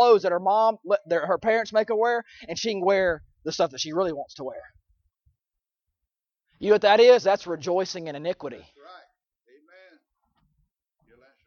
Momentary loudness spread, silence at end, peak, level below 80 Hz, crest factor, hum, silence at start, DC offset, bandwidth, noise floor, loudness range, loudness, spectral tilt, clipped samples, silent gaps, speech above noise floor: 17 LU; 2.55 s; -4 dBFS; -62 dBFS; 20 dB; none; 0 s; under 0.1%; 7 kHz; -88 dBFS; 11 LU; -23 LUFS; -4 dB/octave; under 0.1%; none; 65 dB